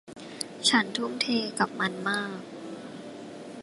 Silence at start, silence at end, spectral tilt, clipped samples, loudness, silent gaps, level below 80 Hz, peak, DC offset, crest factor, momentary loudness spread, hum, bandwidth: 0.05 s; 0 s; -2.5 dB/octave; under 0.1%; -27 LUFS; none; -72 dBFS; -8 dBFS; under 0.1%; 22 dB; 19 LU; none; 11.5 kHz